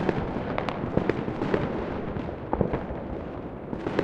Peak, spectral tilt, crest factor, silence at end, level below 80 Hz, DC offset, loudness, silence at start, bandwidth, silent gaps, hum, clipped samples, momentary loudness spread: -4 dBFS; -8.5 dB/octave; 24 dB; 0 s; -42 dBFS; under 0.1%; -30 LUFS; 0 s; 8.4 kHz; none; none; under 0.1%; 8 LU